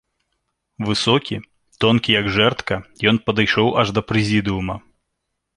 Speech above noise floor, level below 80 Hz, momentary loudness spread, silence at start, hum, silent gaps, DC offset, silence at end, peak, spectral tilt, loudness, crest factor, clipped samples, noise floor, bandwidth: 58 dB; -46 dBFS; 11 LU; 0.8 s; none; none; under 0.1%; 0.8 s; -2 dBFS; -5.5 dB/octave; -18 LUFS; 18 dB; under 0.1%; -76 dBFS; 11 kHz